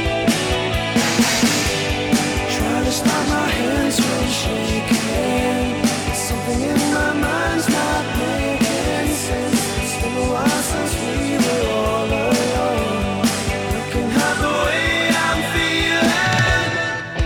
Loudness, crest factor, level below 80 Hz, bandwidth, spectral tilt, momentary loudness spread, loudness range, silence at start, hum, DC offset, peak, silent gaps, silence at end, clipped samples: -18 LUFS; 16 dB; -32 dBFS; over 20 kHz; -4 dB/octave; 5 LU; 2 LU; 0 s; none; under 0.1%; -4 dBFS; none; 0 s; under 0.1%